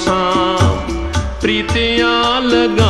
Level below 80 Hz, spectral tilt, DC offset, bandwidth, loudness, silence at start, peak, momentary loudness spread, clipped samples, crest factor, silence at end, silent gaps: -26 dBFS; -5 dB/octave; 0.8%; 12 kHz; -14 LUFS; 0 s; -2 dBFS; 7 LU; under 0.1%; 12 dB; 0 s; none